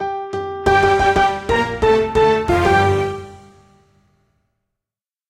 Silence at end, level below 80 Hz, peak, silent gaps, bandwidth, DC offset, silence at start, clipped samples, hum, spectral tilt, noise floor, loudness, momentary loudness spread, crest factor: 1.95 s; -36 dBFS; -2 dBFS; none; 14 kHz; under 0.1%; 0 s; under 0.1%; none; -5.5 dB/octave; -89 dBFS; -16 LUFS; 11 LU; 16 dB